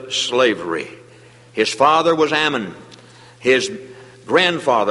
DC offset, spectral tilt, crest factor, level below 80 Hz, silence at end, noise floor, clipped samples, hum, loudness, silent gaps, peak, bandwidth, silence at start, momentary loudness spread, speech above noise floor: under 0.1%; -3 dB/octave; 18 dB; -62 dBFS; 0 s; -45 dBFS; under 0.1%; none; -17 LUFS; none; -2 dBFS; 11.5 kHz; 0 s; 14 LU; 28 dB